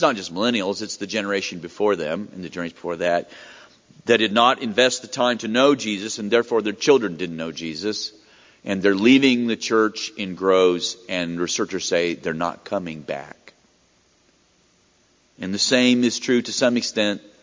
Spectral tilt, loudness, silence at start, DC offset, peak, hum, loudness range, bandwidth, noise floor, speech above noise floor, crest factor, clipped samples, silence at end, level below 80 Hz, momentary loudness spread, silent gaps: -3.5 dB/octave; -21 LUFS; 0 s; under 0.1%; -2 dBFS; none; 7 LU; 7.6 kHz; -60 dBFS; 39 dB; 20 dB; under 0.1%; 0.25 s; -60 dBFS; 13 LU; none